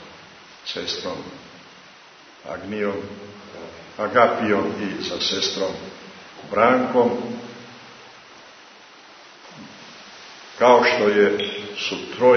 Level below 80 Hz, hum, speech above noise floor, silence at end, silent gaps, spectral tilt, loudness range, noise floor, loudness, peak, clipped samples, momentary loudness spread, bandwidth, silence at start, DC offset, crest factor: -64 dBFS; none; 27 dB; 0 s; none; -4 dB/octave; 10 LU; -47 dBFS; -21 LUFS; -2 dBFS; under 0.1%; 24 LU; 6.6 kHz; 0 s; under 0.1%; 22 dB